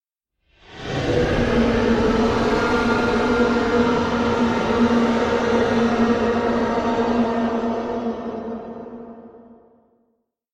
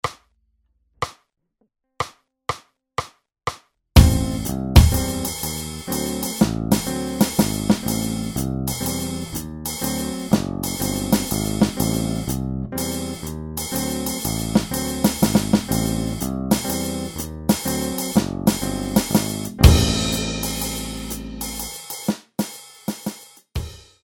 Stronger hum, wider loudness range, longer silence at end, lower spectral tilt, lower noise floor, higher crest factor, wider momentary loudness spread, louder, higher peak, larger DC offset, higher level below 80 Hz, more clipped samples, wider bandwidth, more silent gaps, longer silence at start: neither; about the same, 6 LU vs 6 LU; first, 1 s vs 0.25 s; about the same, -6 dB/octave vs -5 dB/octave; about the same, -72 dBFS vs -70 dBFS; second, 16 dB vs 22 dB; about the same, 11 LU vs 13 LU; about the same, -20 LUFS vs -22 LUFS; second, -6 dBFS vs 0 dBFS; neither; second, -38 dBFS vs -28 dBFS; neither; second, 9 kHz vs 19.5 kHz; neither; first, 0.7 s vs 0.05 s